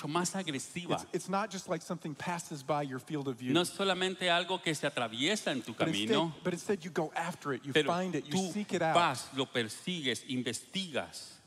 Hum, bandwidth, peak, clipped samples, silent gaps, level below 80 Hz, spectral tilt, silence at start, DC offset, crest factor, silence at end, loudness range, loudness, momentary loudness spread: none; 15.5 kHz; -14 dBFS; under 0.1%; none; -76 dBFS; -4 dB/octave; 0 s; under 0.1%; 20 dB; 0.1 s; 3 LU; -33 LUFS; 8 LU